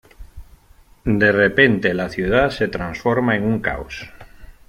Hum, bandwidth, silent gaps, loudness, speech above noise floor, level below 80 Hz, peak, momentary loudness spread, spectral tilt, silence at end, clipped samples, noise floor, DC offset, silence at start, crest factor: none; 15 kHz; none; -18 LUFS; 32 dB; -40 dBFS; -2 dBFS; 15 LU; -7 dB/octave; 0.15 s; under 0.1%; -50 dBFS; under 0.1%; 0.2 s; 18 dB